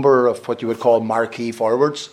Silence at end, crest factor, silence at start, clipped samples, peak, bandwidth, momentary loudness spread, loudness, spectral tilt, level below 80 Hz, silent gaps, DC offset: 0.05 s; 16 dB; 0 s; under 0.1%; -2 dBFS; 13.5 kHz; 8 LU; -19 LUFS; -5.5 dB/octave; -68 dBFS; none; under 0.1%